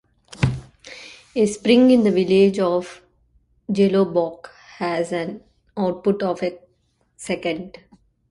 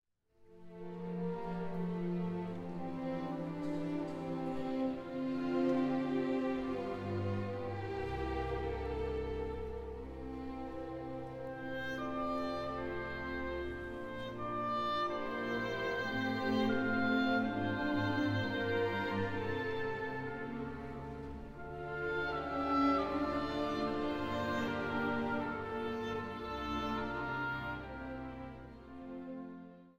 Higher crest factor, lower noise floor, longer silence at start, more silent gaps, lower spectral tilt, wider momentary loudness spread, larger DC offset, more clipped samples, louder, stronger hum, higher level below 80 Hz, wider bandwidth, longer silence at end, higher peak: about the same, 20 dB vs 16 dB; about the same, -65 dBFS vs -65 dBFS; about the same, 0.4 s vs 0.4 s; neither; about the same, -6.5 dB/octave vs -7 dB/octave; first, 23 LU vs 12 LU; neither; neither; first, -20 LUFS vs -38 LUFS; neither; first, -48 dBFS vs -54 dBFS; second, 11.5 kHz vs 15 kHz; first, 0.6 s vs 0.05 s; first, -2 dBFS vs -20 dBFS